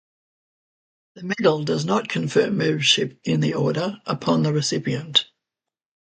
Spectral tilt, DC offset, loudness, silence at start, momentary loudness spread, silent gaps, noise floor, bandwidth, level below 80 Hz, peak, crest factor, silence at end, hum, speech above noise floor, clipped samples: -4.5 dB/octave; under 0.1%; -21 LUFS; 1.15 s; 8 LU; none; -88 dBFS; 9.2 kHz; -64 dBFS; -2 dBFS; 20 dB; 0.95 s; none; 66 dB; under 0.1%